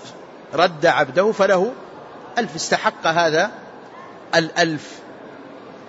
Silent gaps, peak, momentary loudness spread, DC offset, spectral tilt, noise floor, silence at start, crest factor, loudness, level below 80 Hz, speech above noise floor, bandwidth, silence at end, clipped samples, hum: none; -4 dBFS; 22 LU; under 0.1%; -3.5 dB/octave; -39 dBFS; 0 s; 18 dB; -19 LUFS; -64 dBFS; 21 dB; 8 kHz; 0 s; under 0.1%; none